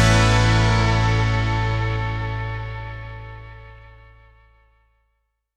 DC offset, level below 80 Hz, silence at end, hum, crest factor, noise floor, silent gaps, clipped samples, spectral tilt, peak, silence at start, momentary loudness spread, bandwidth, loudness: under 0.1%; -30 dBFS; 1.8 s; none; 18 dB; -72 dBFS; none; under 0.1%; -5.5 dB/octave; -4 dBFS; 0 s; 22 LU; 10.5 kHz; -20 LUFS